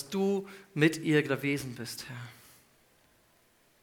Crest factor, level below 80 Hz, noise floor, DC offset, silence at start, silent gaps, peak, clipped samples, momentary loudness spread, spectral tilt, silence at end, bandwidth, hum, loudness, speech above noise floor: 22 dB; -70 dBFS; -66 dBFS; under 0.1%; 0 s; none; -10 dBFS; under 0.1%; 15 LU; -5.5 dB/octave; 1.5 s; 19 kHz; none; -30 LUFS; 36 dB